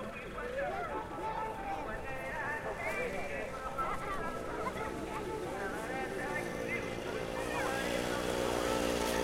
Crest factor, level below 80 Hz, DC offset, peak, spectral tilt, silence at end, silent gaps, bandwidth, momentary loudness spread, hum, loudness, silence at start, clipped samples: 16 dB; -52 dBFS; under 0.1%; -20 dBFS; -4 dB/octave; 0 s; none; 16.5 kHz; 6 LU; none; -37 LUFS; 0 s; under 0.1%